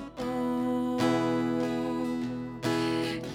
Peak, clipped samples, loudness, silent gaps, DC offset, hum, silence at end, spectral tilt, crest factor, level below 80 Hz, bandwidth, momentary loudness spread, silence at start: -12 dBFS; under 0.1%; -30 LUFS; none; under 0.1%; none; 0 s; -6 dB/octave; 16 dB; -58 dBFS; 15.5 kHz; 7 LU; 0 s